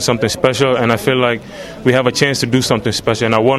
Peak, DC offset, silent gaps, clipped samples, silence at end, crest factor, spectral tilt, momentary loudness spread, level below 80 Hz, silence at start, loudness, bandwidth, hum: 0 dBFS; under 0.1%; none; under 0.1%; 0 s; 14 dB; -4.5 dB/octave; 4 LU; -44 dBFS; 0 s; -14 LUFS; 15.5 kHz; none